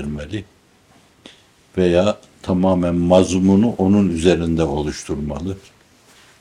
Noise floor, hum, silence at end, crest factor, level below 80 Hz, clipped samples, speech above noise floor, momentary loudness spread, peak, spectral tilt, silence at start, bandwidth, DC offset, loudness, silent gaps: -53 dBFS; none; 0.8 s; 18 dB; -42 dBFS; under 0.1%; 36 dB; 14 LU; -2 dBFS; -7 dB/octave; 0 s; 11 kHz; under 0.1%; -18 LUFS; none